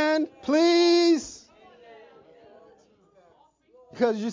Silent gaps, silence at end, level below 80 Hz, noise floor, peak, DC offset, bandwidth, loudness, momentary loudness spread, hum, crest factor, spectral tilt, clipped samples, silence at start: none; 0 s; -68 dBFS; -61 dBFS; -12 dBFS; under 0.1%; 7.6 kHz; -22 LUFS; 14 LU; none; 14 dB; -3.5 dB/octave; under 0.1%; 0 s